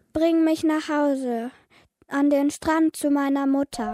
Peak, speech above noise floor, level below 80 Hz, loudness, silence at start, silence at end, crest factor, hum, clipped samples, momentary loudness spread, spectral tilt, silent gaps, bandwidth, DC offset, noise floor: -10 dBFS; 36 dB; -56 dBFS; -23 LUFS; 0.15 s; 0 s; 12 dB; none; under 0.1%; 8 LU; -4.5 dB/octave; none; 15 kHz; under 0.1%; -58 dBFS